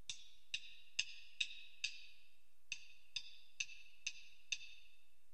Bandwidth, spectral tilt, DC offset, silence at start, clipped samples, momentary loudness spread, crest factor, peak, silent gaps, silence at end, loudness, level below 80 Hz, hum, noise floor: 14.5 kHz; 3 dB/octave; 0.3%; 0.1 s; under 0.1%; 14 LU; 32 dB; -20 dBFS; none; 0.4 s; -47 LUFS; -82 dBFS; none; -76 dBFS